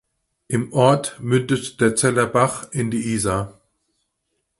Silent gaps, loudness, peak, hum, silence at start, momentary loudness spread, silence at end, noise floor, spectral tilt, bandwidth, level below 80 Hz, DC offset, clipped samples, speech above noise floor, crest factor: none; -20 LUFS; 0 dBFS; none; 0.5 s; 8 LU; 1.1 s; -74 dBFS; -5 dB/octave; 11.5 kHz; -50 dBFS; under 0.1%; under 0.1%; 55 dB; 20 dB